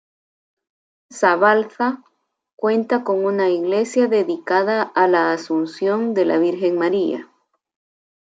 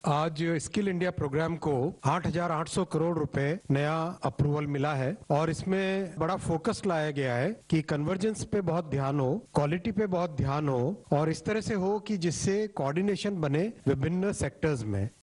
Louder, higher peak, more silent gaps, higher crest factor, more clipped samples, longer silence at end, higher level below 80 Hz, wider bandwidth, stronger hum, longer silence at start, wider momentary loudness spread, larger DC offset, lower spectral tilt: first, -19 LUFS vs -30 LUFS; first, -2 dBFS vs -10 dBFS; first, 2.53-2.58 s vs none; about the same, 18 dB vs 18 dB; neither; first, 1.05 s vs 0.1 s; second, -74 dBFS vs -54 dBFS; second, 9.2 kHz vs 11 kHz; neither; first, 1.1 s vs 0.05 s; first, 7 LU vs 2 LU; neither; about the same, -5.5 dB/octave vs -6.5 dB/octave